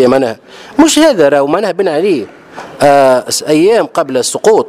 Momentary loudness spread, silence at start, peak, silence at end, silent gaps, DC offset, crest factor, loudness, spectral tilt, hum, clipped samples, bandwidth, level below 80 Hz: 12 LU; 0 s; 0 dBFS; 0 s; none; under 0.1%; 10 dB; -10 LUFS; -4 dB/octave; none; 0.3%; 15.5 kHz; -48 dBFS